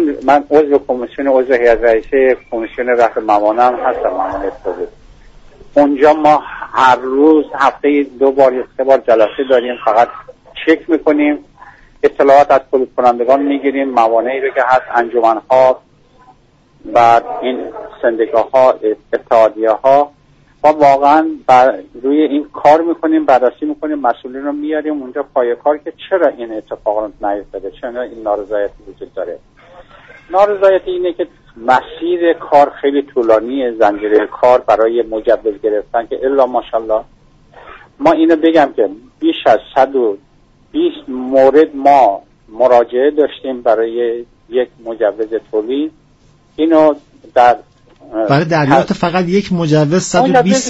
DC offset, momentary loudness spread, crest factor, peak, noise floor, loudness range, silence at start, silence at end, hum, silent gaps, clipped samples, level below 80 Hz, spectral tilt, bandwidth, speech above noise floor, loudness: under 0.1%; 11 LU; 12 dB; 0 dBFS; -49 dBFS; 6 LU; 0 s; 0 s; none; none; under 0.1%; -46 dBFS; -6 dB/octave; 8 kHz; 37 dB; -13 LUFS